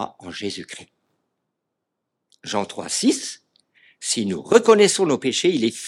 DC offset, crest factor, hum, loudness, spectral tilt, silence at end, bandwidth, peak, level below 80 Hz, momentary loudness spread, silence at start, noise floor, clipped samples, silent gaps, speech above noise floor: under 0.1%; 22 dB; none; -20 LUFS; -3.5 dB/octave; 0 s; 13 kHz; 0 dBFS; -70 dBFS; 19 LU; 0 s; -80 dBFS; under 0.1%; none; 60 dB